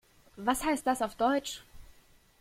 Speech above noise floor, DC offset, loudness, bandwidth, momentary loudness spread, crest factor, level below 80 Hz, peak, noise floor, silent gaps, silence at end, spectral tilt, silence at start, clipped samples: 31 dB; under 0.1%; -31 LUFS; 16.5 kHz; 10 LU; 20 dB; -56 dBFS; -14 dBFS; -61 dBFS; none; 0.55 s; -3 dB/octave; 0.35 s; under 0.1%